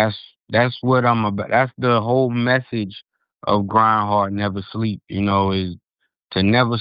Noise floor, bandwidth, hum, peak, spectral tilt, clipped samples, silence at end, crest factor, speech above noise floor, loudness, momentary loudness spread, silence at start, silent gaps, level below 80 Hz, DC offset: -50 dBFS; 5.2 kHz; none; -2 dBFS; -10.5 dB/octave; under 0.1%; 0 s; 18 dB; 32 dB; -19 LUFS; 11 LU; 0 s; none; -54 dBFS; under 0.1%